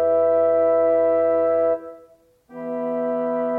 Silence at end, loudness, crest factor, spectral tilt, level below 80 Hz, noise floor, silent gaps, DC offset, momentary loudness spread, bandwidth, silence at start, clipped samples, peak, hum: 0 s; -20 LUFS; 10 dB; -9 dB/octave; -58 dBFS; -53 dBFS; none; under 0.1%; 11 LU; 3.5 kHz; 0 s; under 0.1%; -10 dBFS; none